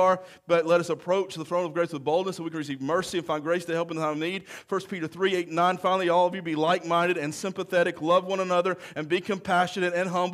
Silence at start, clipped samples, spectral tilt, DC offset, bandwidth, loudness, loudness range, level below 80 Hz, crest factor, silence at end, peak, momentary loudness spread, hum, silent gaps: 0 s; under 0.1%; -5 dB/octave; under 0.1%; 14.5 kHz; -26 LUFS; 4 LU; -70 dBFS; 16 dB; 0 s; -10 dBFS; 8 LU; none; none